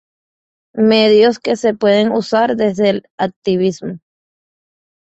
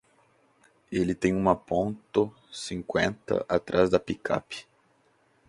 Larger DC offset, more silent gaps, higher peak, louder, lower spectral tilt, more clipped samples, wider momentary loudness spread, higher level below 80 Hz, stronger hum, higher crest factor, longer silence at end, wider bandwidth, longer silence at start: neither; first, 3.10-3.18 s, 3.36-3.42 s vs none; first, -2 dBFS vs -6 dBFS; first, -14 LUFS vs -28 LUFS; about the same, -5.5 dB/octave vs -6 dB/octave; neither; first, 14 LU vs 11 LU; about the same, -58 dBFS vs -54 dBFS; neither; second, 14 dB vs 22 dB; first, 1.15 s vs 0.9 s; second, 8.2 kHz vs 11.5 kHz; second, 0.75 s vs 0.9 s